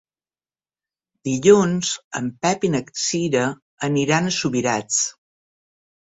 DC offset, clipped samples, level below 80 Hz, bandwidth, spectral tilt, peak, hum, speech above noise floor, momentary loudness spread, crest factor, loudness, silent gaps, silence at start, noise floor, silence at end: under 0.1%; under 0.1%; -60 dBFS; 8.4 kHz; -4 dB/octave; -2 dBFS; none; over 70 dB; 11 LU; 20 dB; -20 LUFS; 2.04-2.11 s, 3.62-3.78 s; 1.25 s; under -90 dBFS; 1.05 s